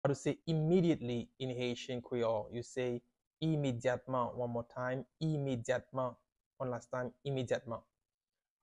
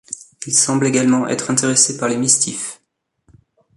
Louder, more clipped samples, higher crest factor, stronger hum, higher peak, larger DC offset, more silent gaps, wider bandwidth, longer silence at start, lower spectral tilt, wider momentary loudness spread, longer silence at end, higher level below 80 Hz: second, -37 LUFS vs -15 LUFS; neither; about the same, 18 dB vs 18 dB; neither; second, -20 dBFS vs 0 dBFS; neither; first, 3.27-3.31 s, 6.46-6.51 s vs none; about the same, 10.5 kHz vs 11.5 kHz; about the same, 0.05 s vs 0.1 s; first, -6.5 dB/octave vs -3 dB/octave; second, 9 LU vs 14 LU; second, 0.85 s vs 1.05 s; second, -68 dBFS vs -60 dBFS